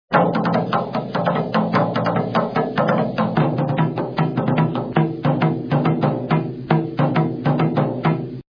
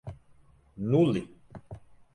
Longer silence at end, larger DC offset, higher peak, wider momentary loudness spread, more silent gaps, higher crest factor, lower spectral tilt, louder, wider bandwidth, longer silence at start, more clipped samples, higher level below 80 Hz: second, 0.1 s vs 0.35 s; neither; first, -2 dBFS vs -12 dBFS; second, 3 LU vs 24 LU; neither; about the same, 16 dB vs 18 dB; about the same, -9.5 dB/octave vs -9 dB/octave; first, -20 LUFS vs -27 LUFS; second, 5.2 kHz vs 10.5 kHz; about the same, 0.1 s vs 0.05 s; neither; first, -52 dBFS vs -58 dBFS